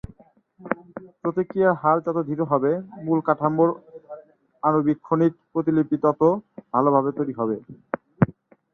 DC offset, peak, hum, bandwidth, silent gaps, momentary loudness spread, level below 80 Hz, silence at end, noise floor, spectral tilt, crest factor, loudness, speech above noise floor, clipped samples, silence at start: under 0.1%; -2 dBFS; none; 3.8 kHz; none; 14 LU; -58 dBFS; 0.4 s; -55 dBFS; -11 dB/octave; 20 dB; -23 LUFS; 34 dB; under 0.1%; 0.6 s